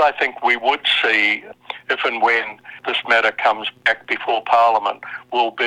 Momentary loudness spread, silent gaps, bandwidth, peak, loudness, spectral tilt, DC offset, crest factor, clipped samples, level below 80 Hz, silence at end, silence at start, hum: 10 LU; none; 11.5 kHz; -2 dBFS; -18 LUFS; -2 dB/octave; under 0.1%; 18 dB; under 0.1%; -64 dBFS; 0 s; 0 s; none